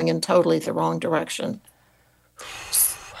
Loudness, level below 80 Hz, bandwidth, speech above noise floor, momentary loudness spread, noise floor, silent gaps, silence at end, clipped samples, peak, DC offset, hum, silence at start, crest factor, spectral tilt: -22 LUFS; -60 dBFS; 14.5 kHz; 37 dB; 18 LU; -60 dBFS; none; 0 s; under 0.1%; -6 dBFS; under 0.1%; none; 0 s; 18 dB; -3.5 dB/octave